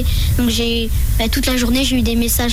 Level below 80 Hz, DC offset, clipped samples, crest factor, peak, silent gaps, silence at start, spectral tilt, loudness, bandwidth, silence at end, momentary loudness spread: -20 dBFS; under 0.1%; under 0.1%; 8 dB; -6 dBFS; none; 0 s; -4.5 dB/octave; -16 LUFS; 18 kHz; 0 s; 3 LU